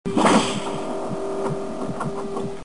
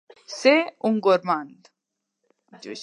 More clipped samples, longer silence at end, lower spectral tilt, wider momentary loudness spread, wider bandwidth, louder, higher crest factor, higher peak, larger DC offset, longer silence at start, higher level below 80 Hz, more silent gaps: neither; about the same, 0 s vs 0 s; about the same, -5 dB/octave vs -4.5 dB/octave; second, 11 LU vs 21 LU; about the same, 10.5 kHz vs 11 kHz; second, -24 LUFS vs -21 LUFS; about the same, 18 dB vs 20 dB; about the same, -6 dBFS vs -4 dBFS; first, 2% vs under 0.1%; second, 0.05 s vs 0.3 s; first, -50 dBFS vs -80 dBFS; neither